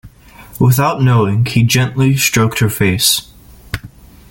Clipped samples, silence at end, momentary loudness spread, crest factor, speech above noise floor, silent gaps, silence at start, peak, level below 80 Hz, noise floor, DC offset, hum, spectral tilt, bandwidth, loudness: under 0.1%; 0.45 s; 14 LU; 14 dB; 26 dB; none; 0.05 s; 0 dBFS; -40 dBFS; -38 dBFS; under 0.1%; none; -4.5 dB/octave; 17 kHz; -13 LUFS